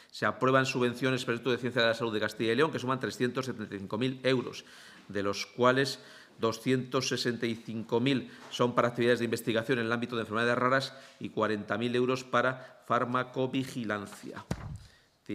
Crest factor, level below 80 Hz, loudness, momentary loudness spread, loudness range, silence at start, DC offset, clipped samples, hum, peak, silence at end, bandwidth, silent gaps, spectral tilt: 22 dB; -64 dBFS; -30 LUFS; 13 LU; 3 LU; 0.15 s; under 0.1%; under 0.1%; none; -10 dBFS; 0 s; 15.5 kHz; none; -5 dB/octave